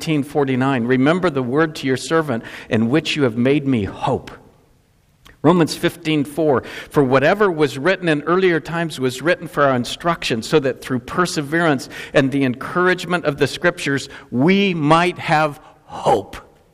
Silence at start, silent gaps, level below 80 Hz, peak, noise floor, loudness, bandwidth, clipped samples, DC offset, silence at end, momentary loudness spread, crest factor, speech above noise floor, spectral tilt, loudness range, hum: 0 s; none; -50 dBFS; 0 dBFS; -56 dBFS; -18 LUFS; 15.5 kHz; under 0.1%; under 0.1%; 0.3 s; 7 LU; 18 dB; 39 dB; -5.5 dB/octave; 3 LU; none